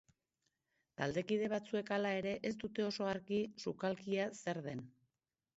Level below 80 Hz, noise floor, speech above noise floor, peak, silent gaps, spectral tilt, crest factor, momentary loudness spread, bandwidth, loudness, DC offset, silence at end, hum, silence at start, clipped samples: -74 dBFS; -90 dBFS; 50 dB; -20 dBFS; none; -4.5 dB/octave; 20 dB; 7 LU; 7.6 kHz; -40 LUFS; under 0.1%; 0.65 s; none; 1 s; under 0.1%